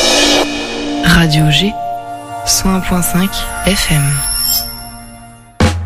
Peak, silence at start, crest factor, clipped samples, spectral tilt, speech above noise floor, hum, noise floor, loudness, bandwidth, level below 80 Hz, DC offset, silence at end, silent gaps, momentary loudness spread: 0 dBFS; 0 s; 14 dB; under 0.1%; -3.5 dB/octave; 23 dB; none; -36 dBFS; -12 LUFS; 16 kHz; -26 dBFS; under 0.1%; 0 s; none; 14 LU